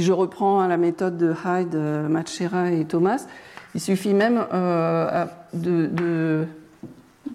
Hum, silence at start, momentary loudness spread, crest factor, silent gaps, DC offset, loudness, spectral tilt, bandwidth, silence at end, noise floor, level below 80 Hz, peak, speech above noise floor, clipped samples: none; 0 s; 11 LU; 12 dB; none; under 0.1%; -23 LUFS; -7 dB/octave; 14 kHz; 0 s; -44 dBFS; -68 dBFS; -10 dBFS; 22 dB; under 0.1%